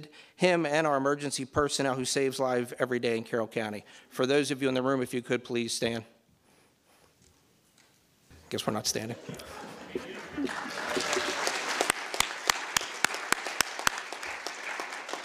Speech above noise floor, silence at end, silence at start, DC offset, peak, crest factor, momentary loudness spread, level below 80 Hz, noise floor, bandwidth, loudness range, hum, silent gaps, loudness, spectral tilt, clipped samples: 35 dB; 0 s; 0 s; under 0.1%; -8 dBFS; 24 dB; 12 LU; -64 dBFS; -65 dBFS; 16 kHz; 9 LU; none; none; -30 LUFS; -3 dB/octave; under 0.1%